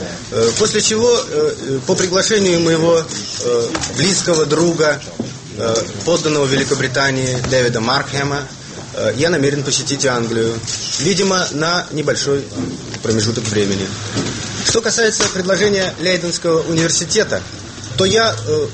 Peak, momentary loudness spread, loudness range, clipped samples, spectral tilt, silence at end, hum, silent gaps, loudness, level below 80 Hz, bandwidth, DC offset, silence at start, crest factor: -2 dBFS; 9 LU; 3 LU; under 0.1%; -3.5 dB/octave; 0 s; none; none; -16 LUFS; -44 dBFS; 8.8 kHz; under 0.1%; 0 s; 14 dB